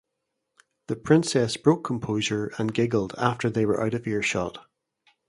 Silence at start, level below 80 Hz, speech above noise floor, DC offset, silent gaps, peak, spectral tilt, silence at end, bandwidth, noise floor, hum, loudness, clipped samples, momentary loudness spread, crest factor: 0.9 s; -58 dBFS; 56 dB; under 0.1%; none; -6 dBFS; -5.5 dB/octave; 0.7 s; 11.5 kHz; -81 dBFS; none; -25 LUFS; under 0.1%; 7 LU; 20 dB